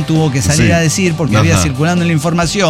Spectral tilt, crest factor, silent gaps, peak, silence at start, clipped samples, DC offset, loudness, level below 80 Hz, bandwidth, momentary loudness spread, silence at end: -5 dB/octave; 10 dB; none; -2 dBFS; 0 s; under 0.1%; under 0.1%; -12 LUFS; -32 dBFS; 15.5 kHz; 3 LU; 0 s